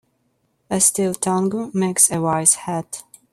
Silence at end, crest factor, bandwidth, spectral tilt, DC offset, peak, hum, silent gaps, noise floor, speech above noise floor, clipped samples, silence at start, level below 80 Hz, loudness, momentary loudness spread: 0.3 s; 20 dB; 16 kHz; -4 dB/octave; under 0.1%; 0 dBFS; none; none; -67 dBFS; 48 dB; under 0.1%; 0.7 s; -60 dBFS; -18 LUFS; 12 LU